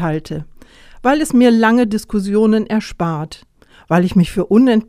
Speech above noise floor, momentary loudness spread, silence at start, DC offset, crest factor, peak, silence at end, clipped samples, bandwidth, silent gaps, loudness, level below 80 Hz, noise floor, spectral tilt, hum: 26 dB; 12 LU; 0 s; under 0.1%; 14 dB; 0 dBFS; 0.05 s; under 0.1%; 14 kHz; none; -15 LUFS; -40 dBFS; -40 dBFS; -6.5 dB/octave; none